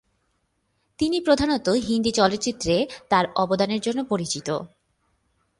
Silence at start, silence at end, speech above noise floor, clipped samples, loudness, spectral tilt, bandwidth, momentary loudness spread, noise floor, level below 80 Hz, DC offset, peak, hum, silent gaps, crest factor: 1 s; 0.95 s; 49 dB; under 0.1%; -23 LUFS; -4.5 dB/octave; 11.5 kHz; 6 LU; -71 dBFS; -50 dBFS; under 0.1%; -4 dBFS; none; none; 20 dB